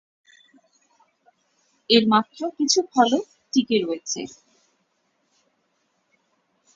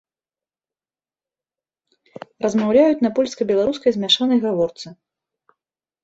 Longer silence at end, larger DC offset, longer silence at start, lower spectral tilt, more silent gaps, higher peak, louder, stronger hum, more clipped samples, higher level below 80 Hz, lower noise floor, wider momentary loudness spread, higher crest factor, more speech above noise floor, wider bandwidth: first, 2.45 s vs 1.1 s; neither; second, 1.9 s vs 2.4 s; second, -3 dB/octave vs -5 dB/octave; neither; about the same, -2 dBFS vs -4 dBFS; second, -21 LUFS vs -18 LUFS; neither; neither; second, -70 dBFS vs -60 dBFS; second, -70 dBFS vs under -90 dBFS; first, 13 LU vs 10 LU; about the same, 22 dB vs 18 dB; second, 49 dB vs over 72 dB; about the same, 7.8 kHz vs 8 kHz